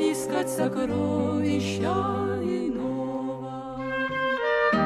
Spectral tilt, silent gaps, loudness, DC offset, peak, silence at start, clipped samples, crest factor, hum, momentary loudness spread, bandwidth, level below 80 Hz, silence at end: -5.5 dB/octave; none; -27 LUFS; under 0.1%; -12 dBFS; 0 s; under 0.1%; 14 dB; none; 7 LU; 14 kHz; -56 dBFS; 0 s